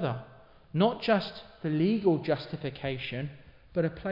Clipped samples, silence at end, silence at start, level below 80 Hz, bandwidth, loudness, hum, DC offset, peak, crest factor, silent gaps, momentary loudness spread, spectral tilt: under 0.1%; 0 s; 0 s; -60 dBFS; 5.8 kHz; -30 LUFS; none; under 0.1%; -12 dBFS; 18 dB; none; 12 LU; -9 dB/octave